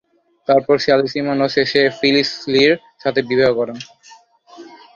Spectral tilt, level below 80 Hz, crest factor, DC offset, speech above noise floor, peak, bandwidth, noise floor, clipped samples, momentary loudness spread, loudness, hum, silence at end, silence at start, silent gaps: -5 dB/octave; -56 dBFS; 16 dB; under 0.1%; 31 dB; 0 dBFS; 7.4 kHz; -47 dBFS; under 0.1%; 9 LU; -16 LUFS; none; 0.3 s; 0.5 s; none